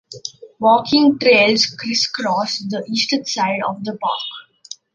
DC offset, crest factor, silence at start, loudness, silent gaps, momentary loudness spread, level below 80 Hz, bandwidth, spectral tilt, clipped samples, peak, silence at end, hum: under 0.1%; 16 dB; 0.1 s; -17 LUFS; none; 19 LU; -62 dBFS; 9.8 kHz; -3.5 dB/octave; under 0.1%; -2 dBFS; 0.2 s; none